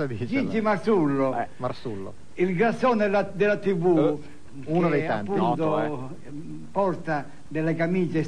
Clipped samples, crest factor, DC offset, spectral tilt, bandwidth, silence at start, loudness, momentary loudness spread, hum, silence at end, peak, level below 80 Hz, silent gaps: under 0.1%; 16 dB; 1%; -8 dB/octave; 10 kHz; 0 s; -25 LUFS; 14 LU; none; 0 s; -10 dBFS; -56 dBFS; none